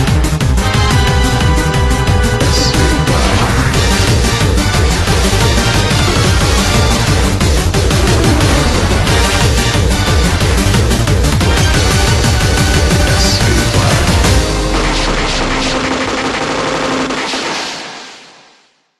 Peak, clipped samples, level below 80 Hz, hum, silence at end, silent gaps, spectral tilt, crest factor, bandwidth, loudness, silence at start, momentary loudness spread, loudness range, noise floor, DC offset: 0 dBFS; under 0.1%; -16 dBFS; none; 0.8 s; none; -4.5 dB/octave; 12 dB; 13 kHz; -12 LUFS; 0 s; 4 LU; 3 LU; -50 dBFS; under 0.1%